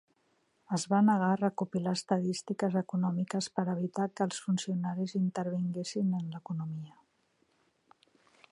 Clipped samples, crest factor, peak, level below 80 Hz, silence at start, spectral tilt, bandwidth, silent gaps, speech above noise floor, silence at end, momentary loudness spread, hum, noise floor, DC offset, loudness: under 0.1%; 20 dB; -14 dBFS; -80 dBFS; 0.7 s; -6 dB/octave; 11.5 kHz; none; 42 dB; 1.6 s; 10 LU; none; -73 dBFS; under 0.1%; -32 LUFS